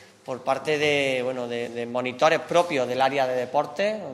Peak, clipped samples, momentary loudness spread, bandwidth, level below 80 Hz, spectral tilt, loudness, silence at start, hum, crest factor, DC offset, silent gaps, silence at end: -6 dBFS; under 0.1%; 8 LU; 13 kHz; -72 dBFS; -4 dB/octave; -24 LUFS; 0 s; none; 18 dB; under 0.1%; none; 0 s